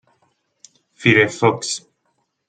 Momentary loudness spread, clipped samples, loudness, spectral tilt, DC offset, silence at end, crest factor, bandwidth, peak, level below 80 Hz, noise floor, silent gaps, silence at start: 12 LU; under 0.1%; -17 LUFS; -4.5 dB/octave; under 0.1%; 0.7 s; 20 dB; 9.4 kHz; 0 dBFS; -60 dBFS; -69 dBFS; none; 1 s